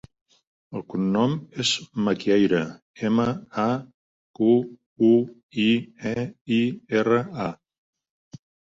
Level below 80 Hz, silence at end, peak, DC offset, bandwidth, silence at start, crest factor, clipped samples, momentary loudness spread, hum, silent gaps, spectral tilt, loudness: -62 dBFS; 1.2 s; -8 dBFS; under 0.1%; 7.8 kHz; 0.7 s; 16 dB; under 0.1%; 11 LU; none; 2.82-2.94 s, 3.94-4.34 s, 4.86-4.96 s, 5.43-5.49 s, 6.41-6.45 s; -5.5 dB/octave; -24 LUFS